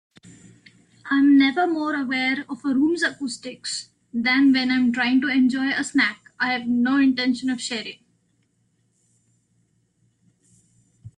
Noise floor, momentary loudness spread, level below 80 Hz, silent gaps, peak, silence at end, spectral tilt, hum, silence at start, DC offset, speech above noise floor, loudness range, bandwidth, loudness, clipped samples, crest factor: -67 dBFS; 13 LU; -68 dBFS; none; -8 dBFS; 0.1 s; -3 dB/octave; none; 1.05 s; under 0.1%; 46 dB; 7 LU; 10 kHz; -21 LUFS; under 0.1%; 16 dB